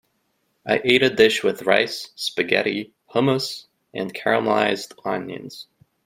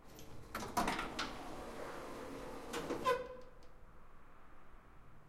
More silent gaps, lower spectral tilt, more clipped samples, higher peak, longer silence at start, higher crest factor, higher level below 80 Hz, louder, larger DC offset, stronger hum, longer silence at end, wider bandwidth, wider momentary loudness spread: neither; about the same, -4.5 dB/octave vs -3.5 dB/octave; neither; first, 0 dBFS vs -22 dBFS; first, 0.65 s vs 0 s; about the same, 22 dB vs 22 dB; second, -64 dBFS vs -58 dBFS; first, -21 LUFS vs -42 LUFS; neither; neither; first, 0.4 s vs 0 s; about the same, 16 kHz vs 16 kHz; second, 18 LU vs 25 LU